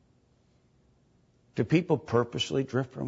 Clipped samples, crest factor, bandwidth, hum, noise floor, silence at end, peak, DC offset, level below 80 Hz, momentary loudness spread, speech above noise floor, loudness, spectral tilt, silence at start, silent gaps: under 0.1%; 20 dB; 8 kHz; none; -66 dBFS; 0 s; -10 dBFS; under 0.1%; -64 dBFS; 7 LU; 38 dB; -29 LUFS; -6 dB/octave; 1.55 s; none